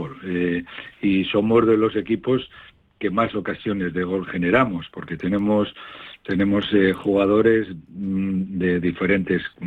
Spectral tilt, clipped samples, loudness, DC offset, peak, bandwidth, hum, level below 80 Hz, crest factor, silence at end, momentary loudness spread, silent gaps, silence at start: -8.5 dB/octave; under 0.1%; -21 LUFS; under 0.1%; -4 dBFS; 4.6 kHz; none; -52 dBFS; 16 dB; 0 s; 11 LU; none; 0 s